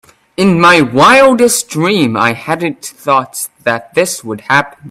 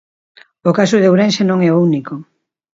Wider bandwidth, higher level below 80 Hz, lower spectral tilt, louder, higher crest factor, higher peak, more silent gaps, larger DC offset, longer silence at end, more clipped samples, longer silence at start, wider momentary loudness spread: first, 16.5 kHz vs 7.8 kHz; first, -50 dBFS vs -62 dBFS; second, -4 dB/octave vs -6.5 dB/octave; first, -10 LUFS vs -13 LUFS; about the same, 12 dB vs 14 dB; about the same, 0 dBFS vs 0 dBFS; neither; neither; second, 0 s vs 0.55 s; first, 0.1% vs under 0.1%; second, 0.4 s vs 0.65 s; about the same, 12 LU vs 11 LU